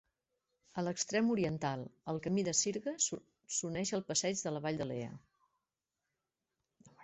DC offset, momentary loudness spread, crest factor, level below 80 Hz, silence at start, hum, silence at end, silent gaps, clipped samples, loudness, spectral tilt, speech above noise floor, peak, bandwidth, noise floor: under 0.1%; 10 LU; 20 dB; -72 dBFS; 0.75 s; none; 0 s; none; under 0.1%; -36 LUFS; -3.5 dB/octave; 54 dB; -18 dBFS; 8.2 kHz; -90 dBFS